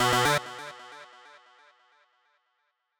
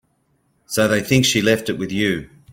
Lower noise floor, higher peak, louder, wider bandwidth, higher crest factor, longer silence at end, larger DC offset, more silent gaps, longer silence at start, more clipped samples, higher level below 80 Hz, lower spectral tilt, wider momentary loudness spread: first, -77 dBFS vs -64 dBFS; second, -10 dBFS vs -2 dBFS; second, -26 LUFS vs -18 LUFS; first, over 20 kHz vs 17 kHz; about the same, 22 dB vs 18 dB; first, 1.95 s vs 0.25 s; neither; neither; second, 0 s vs 0.7 s; neither; second, -64 dBFS vs -50 dBFS; about the same, -3 dB/octave vs -4 dB/octave; first, 26 LU vs 9 LU